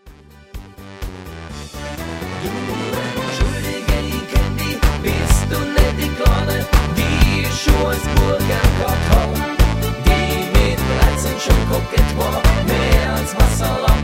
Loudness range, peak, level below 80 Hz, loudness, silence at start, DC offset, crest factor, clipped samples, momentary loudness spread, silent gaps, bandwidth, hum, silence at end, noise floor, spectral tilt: 7 LU; 0 dBFS; -20 dBFS; -18 LUFS; 0.05 s; under 0.1%; 16 dB; under 0.1%; 13 LU; none; 16.5 kHz; none; 0 s; -42 dBFS; -5 dB/octave